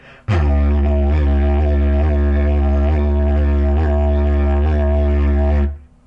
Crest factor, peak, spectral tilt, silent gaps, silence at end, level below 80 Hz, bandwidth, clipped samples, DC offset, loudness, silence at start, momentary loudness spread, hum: 8 dB; -6 dBFS; -10 dB/octave; none; 0.3 s; -16 dBFS; 3.8 kHz; under 0.1%; under 0.1%; -17 LUFS; 0.3 s; 1 LU; none